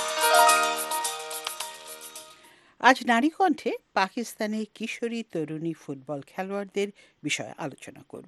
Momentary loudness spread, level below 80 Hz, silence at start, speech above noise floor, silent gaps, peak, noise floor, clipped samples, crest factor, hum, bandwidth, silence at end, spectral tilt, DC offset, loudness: 18 LU; -78 dBFS; 0 s; 25 dB; none; -4 dBFS; -55 dBFS; under 0.1%; 24 dB; none; 12.5 kHz; 0.05 s; -2.5 dB/octave; under 0.1%; -26 LUFS